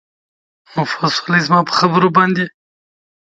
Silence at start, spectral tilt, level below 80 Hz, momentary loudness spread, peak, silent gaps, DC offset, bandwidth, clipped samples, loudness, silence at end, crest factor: 0.75 s; -5.5 dB/octave; -60 dBFS; 10 LU; 0 dBFS; none; under 0.1%; 7.8 kHz; under 0.1%; -15 LUFS; 0.8 s; 16 dB